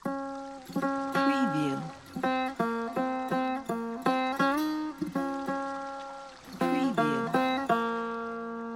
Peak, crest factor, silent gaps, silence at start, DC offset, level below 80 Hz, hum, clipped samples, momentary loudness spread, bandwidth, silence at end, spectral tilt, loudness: -12 dBFS; 18 dB; none; 0.05 s; under 0.1%; -64 dBFS; none; under 0.1%; 10 LU; 16.5 kHz; 0 s; -5.5 dB/octave; -30 LUFS